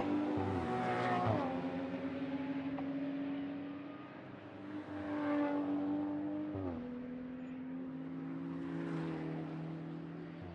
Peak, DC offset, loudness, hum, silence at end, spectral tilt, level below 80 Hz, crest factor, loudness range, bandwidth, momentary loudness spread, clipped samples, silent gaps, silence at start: -22 dBFS; under 0.1%; -40 LUFS; none; 0 s; -8 dB/octave; -72 dBFS; 18 dB; 5 LU; 8.6 kHz; 11 LU; under 0.1%; none; 0 s